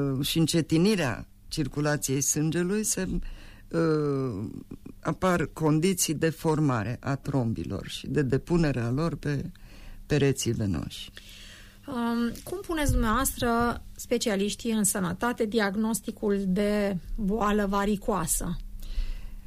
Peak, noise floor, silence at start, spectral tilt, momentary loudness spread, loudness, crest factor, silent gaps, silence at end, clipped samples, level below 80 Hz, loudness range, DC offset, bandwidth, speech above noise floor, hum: -14 dBFS; -47 dBFS; 0 s; -5 dB/octave; 13 LU; -27 LUFS; 14 dB; none; 0 s; under 0.1%; -40 dBFS; 3 LU; under 0.1%; 15.5 kHz; 21 dB; none